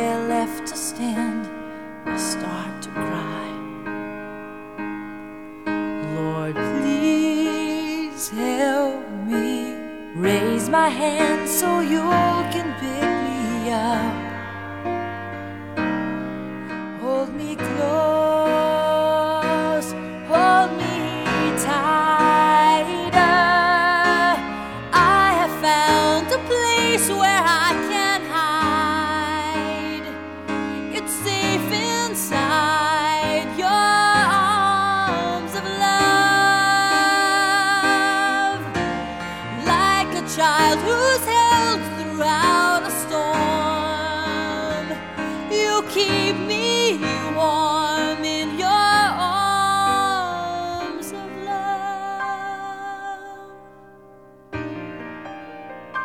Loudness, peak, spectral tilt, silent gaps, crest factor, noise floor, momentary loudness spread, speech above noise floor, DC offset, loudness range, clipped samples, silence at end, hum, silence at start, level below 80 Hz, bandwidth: -20 LUFS; -4 dBFS; -3.5 dB/octave; none; 18 dB; -47 dBFS; 15 LU; 27 dB; 0.2%; 11 LU; under 0.1%; 0 s; none; 0 s; -50 dBFS; 18.5 kHz